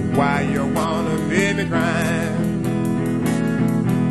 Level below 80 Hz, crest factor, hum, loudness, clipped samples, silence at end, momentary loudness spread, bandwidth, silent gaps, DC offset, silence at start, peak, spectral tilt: -44 dBFS; 16 dB; none; -20 LUFS; under 0.1%; 0 s; 3 LU; 13.5 kHz; none; 0.5%; 0 s; -4 dBFS; -6.5 dB/octave